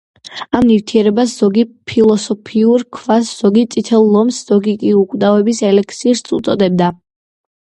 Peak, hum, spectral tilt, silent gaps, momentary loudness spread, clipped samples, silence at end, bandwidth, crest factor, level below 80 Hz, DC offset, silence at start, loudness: 0 dBFS; none; -6 dB/octave; none; 5 LU; under 0.1%; 0.7 s; 11 kHz; 12 dB; -50 dBFS; under 0.1%; 0.25 s; -13 LUFS